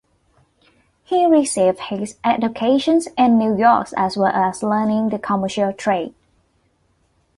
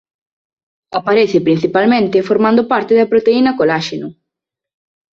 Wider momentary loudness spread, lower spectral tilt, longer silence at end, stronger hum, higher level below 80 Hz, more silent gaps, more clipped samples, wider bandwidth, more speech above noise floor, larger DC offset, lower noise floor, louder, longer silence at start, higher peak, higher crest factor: second, 7 LU vs 10 LU; second, -5 dB/octave vs -6.5 dB/octave; first, 1.3 s vs 1 s; neither; about the same, -58 dBFS vs -56 dBFS; neither; neither; first, 11.5 kHz vs 7.4 kHz; second, 45 dB vs 69 dB; neither; second, -63 dBFS vs -82 dBFS; second, -18 LUFS vs -13 LUFS; first, 1.1 s vs 0.9 s; about the same, -2 dBFS vs -2 dBFS; about the same, 16 dB vs 14 dB